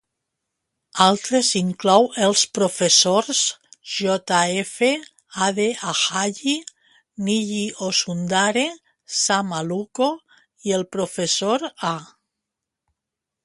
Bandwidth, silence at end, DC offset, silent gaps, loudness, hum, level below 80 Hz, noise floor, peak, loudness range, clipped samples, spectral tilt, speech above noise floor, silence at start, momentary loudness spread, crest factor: 11.5 kHz; 1.4 s; under 0.1%; none; -20 LUFS; none; -68 dBFS; -85 dBFS; 0 dBFS; 6 LU; under 0.1%; -2.5 dB/octave; 64 dB; 0.95 s; 10 LU; 22 dB